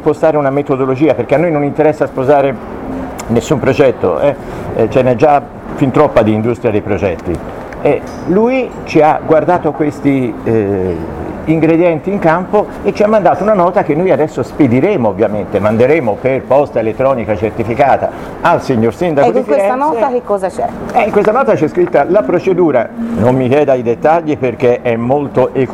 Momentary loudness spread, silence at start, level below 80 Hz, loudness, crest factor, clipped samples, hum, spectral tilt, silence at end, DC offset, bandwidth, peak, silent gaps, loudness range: 6 LU; 0 s; -38 dBFS; -12 LUFS; 12 dB; under 0.1%; none; -7.5 dB/octave; 0 s; under 0.1%; 14 kHz; 0 dBFS; none; 2 LU